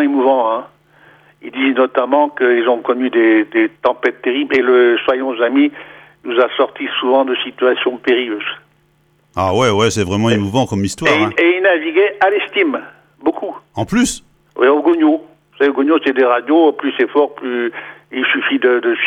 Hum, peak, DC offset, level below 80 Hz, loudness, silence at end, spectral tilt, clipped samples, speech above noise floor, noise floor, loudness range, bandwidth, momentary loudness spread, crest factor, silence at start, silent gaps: none; -2 dBFS; under 0.1%; -52 dBFS; -15 LUFS; 0 s; -5 dB/octave; under 0.1%; 42 dB; -56 dBFS; 3 LU; 13 kHz; 10 LU; 14 dB; 0 s; none